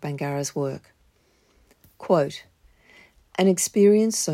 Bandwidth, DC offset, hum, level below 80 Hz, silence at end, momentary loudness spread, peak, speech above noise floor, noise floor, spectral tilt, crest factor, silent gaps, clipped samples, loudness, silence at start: 16 kHz; under 0.1%; none; -64 dBFS; 0 s; 20 LU; -8 dBFS; 41 dB; -63 dBFS; -5 dB/octave; 16 dB; none; under 0.1%; -22 LUFS; 0 s